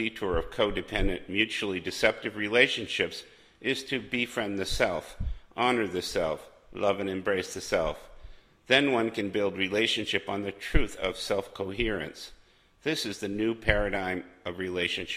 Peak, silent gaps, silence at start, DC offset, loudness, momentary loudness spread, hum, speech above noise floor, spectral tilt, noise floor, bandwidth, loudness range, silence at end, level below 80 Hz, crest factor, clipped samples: -6 dBFS; none; 0 s; under 0.1%; -29 LUFS; 11 LU; none; 20 dB; -4 dB/octave; -49 dBFS; 15.5 kHz; 3 LU; 0 s; -40 dBFS; 24 dB; under 0.1%